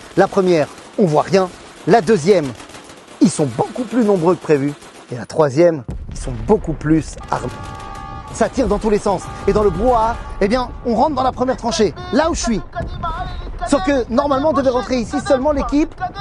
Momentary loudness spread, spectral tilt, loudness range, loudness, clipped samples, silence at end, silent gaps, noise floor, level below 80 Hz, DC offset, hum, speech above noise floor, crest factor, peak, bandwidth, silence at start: 13 LU; -6 dB/octave; 3 LU; -17 LUFS; under 0.1%; 0 s; none; -38 dBFS; -32 dBFS; under 0.1%; none; 22 dB; 16 dB; 0 dBFS; 12 kHz; 0 s